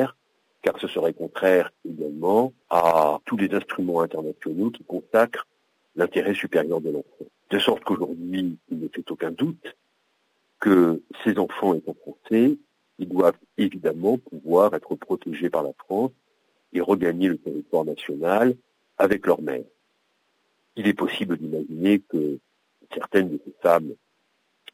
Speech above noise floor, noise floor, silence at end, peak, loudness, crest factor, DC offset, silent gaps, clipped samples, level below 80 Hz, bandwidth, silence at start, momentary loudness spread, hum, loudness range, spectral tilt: 47 dB; -70 dBFS; 0.8 s; -6 dBFS; -24 LUFS; 18 dB; under 0.1%; none; under 0.1%; -66 dBFS; 16 kHz; 0 s; 12 LU; none; 4 LU; -6.5 dB/octave